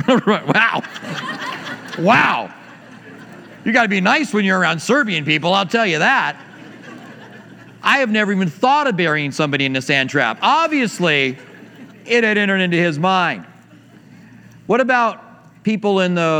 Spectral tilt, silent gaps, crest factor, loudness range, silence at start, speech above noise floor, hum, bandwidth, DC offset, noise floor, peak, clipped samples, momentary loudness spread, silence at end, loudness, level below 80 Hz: -5 dB/octave; none; 18 dB; 3 LU; 0 s; 28 dB; none; 16 kHz; under 0.1%; -45 dBFS; 0 dBFS; under 0.1%; 13 LU; 0 s; -16 LUFS; -68 dBFS